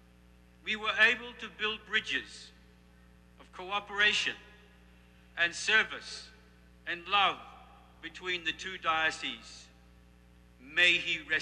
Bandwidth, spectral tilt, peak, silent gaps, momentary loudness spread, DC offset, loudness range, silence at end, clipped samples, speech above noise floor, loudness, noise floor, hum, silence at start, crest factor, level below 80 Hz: 13.5 kHz; -1.5 dB/octave; -12 dBFS; none; 21 LU; under 0.1%; 3 LU; 0 s; under 0.1%; 28 dB; -29 LUFS; -59 dBFS; 60 Hz at -60 dBFS; 0.65 s; 22 dB; -62 dBFS